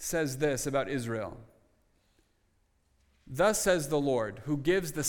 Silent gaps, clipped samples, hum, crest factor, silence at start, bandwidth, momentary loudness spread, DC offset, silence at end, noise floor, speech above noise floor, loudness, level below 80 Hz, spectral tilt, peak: none; under 0.1%; none; 18 dB; 0 s; 19 kHz; 9 LU; under 0.1%; 0 s; -71 dBFS; 41 dB; -30 LUFS; -54 dBFS; -4.5 dB/octave; -14 dBFS